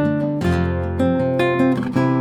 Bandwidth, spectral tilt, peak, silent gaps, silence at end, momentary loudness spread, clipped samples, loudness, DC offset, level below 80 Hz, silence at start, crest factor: 12.5 kHz; -8 dB/octave; -6 dBFS; none; 0 s; 3 LU; under 0.1%; -19 LUFS; under 0.1%; -38 dBFS; 0 s; 12 dB